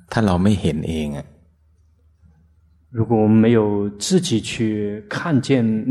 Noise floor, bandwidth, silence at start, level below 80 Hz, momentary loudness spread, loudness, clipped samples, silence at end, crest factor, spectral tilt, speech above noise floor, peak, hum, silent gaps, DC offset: -56 dBFS; 12.5 kHz; 0.1 s; -44 dBFS; 11 LU; -19 LUFS; under 0.1%; 0 s; 18 dB; -6 dB/octave; 38 dB; -2 dBFS; none; none; under 0.1%